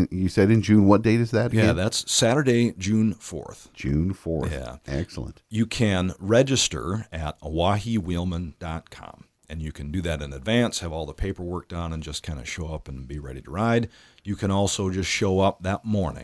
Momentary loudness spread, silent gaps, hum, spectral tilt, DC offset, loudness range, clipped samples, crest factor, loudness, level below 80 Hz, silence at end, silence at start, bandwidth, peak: 16 LU; none; none; -5 dB/octave; under 0.1%; 8 LU; under 0.1%; 22 dB; -24 LUFS; -42 dBFS; 0 s; 0 s; 11 kHz; -2 dBFS